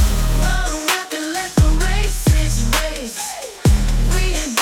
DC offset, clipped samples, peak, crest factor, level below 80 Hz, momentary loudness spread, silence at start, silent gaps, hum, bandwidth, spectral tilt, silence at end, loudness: under 0.1%; under 0.1%; -2 dBFS; 14 dB; -18 dBFS; 7 LU; 0 s; none; none; 18.5 kHz; -4 dB/octave; 0 s; -19 LUFS